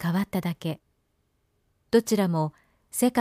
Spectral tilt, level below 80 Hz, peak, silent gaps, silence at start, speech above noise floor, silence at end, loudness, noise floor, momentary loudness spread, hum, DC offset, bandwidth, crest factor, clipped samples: -5.5 dB/octave; -64 dBFS; -8 dBFS; none; 0 s; 47 dB; 0 s; -27 LUFS; -72 dBFS; 11 LU; none; under 0.1%; 15.5 kHz; 18 dB; under 0.1%